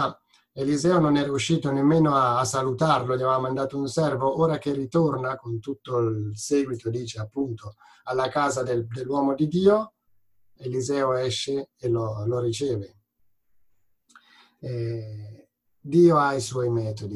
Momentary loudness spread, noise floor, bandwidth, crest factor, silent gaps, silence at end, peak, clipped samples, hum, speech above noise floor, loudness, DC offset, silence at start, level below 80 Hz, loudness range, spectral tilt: 13 LU; -68 dBFS; 12.5 kHz; 18 dB; none; 0 s; -6 dBFS; under 0.1%; none; 44 dB; -24 LUFS; under 0.1%; 0 s; -58 dBFS; 8 LU; -6 dB/octave